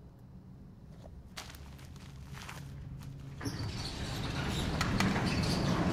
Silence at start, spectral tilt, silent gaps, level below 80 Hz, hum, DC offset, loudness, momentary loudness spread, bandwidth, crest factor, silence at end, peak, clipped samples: 0 s; -5 dB/octave; none; -48 dBFS; none; under 0.1%; -36 LUFS; 22 LU; 16 kHz; 24 dB; 0 s; -12 dBFS; under 0.1%